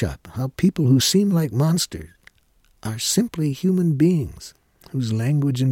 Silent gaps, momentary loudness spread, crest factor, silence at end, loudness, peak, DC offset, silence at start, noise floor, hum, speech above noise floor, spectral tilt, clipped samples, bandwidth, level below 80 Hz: none; 15 LU; 16 dB; 0 s; -20 LUFS; -6 dBFS; under 0.1%; 0 s; -60 dBFS; none; 40 dB; -5.5 dB/octave; under 0.1%; 17 kHz; -46 dBFS